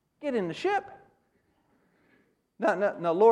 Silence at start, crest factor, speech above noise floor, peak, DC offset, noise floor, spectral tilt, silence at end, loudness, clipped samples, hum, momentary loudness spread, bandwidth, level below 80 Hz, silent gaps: 0.2 s; 20 dB; 45 dB; -10 dBFS; under 0.1%; -71 dBFS; -6 dB/octave; 0 s; -28 LUFS; under 0.1%; none; 6 LU; 9.6 kHz; -76 dBFS; none